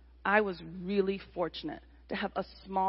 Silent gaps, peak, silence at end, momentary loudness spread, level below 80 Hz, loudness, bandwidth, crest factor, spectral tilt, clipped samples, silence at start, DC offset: none; -12 dBFS; 0 s; 13 LU; -58 dBFS; -33 LUFS; 5.8 kHz; 22 dB; -3.5 dB/octave; under 0.1%; 0.25 s; under 0.1%